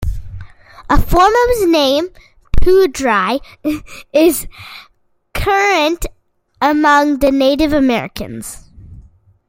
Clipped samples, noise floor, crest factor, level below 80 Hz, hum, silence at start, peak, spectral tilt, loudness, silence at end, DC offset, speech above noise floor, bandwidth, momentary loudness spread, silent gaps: under 0.1%; -43 dBFS; 14 dB; -26 dBFS; none; 0 s; 0 dBFS; -4.5 dB/octave; -14 LUFS; 0.5 s; under 0.1%; 30 dB; 16.5 kHz; 18 LU; none